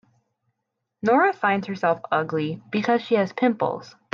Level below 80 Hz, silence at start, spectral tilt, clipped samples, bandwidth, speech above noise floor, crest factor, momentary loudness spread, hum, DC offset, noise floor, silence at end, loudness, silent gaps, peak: -72 dBFS; 1.05 s; -7 dB/octave; under 0.1%; 7.2 kHz; 58 dB; 16 dB; 8 LU; none; under 0.1%; -80 dBFS; 0.25 s; -23 LUFS; none; -8 dBFS